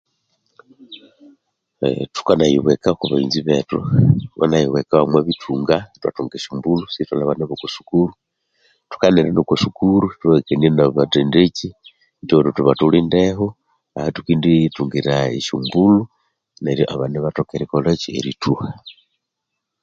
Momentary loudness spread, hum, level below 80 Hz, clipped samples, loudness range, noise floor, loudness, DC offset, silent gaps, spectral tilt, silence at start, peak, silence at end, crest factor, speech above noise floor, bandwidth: 10 LU; none; -46 dBFS; under 0.1%; 5 LU; -79 dBFS; -18 LUFS; under 0.1%; none; -7 dB/octave; 0.9 s; 0 dBFS; 0.9 s; 18 dB; 62 dB; 7.6 kHz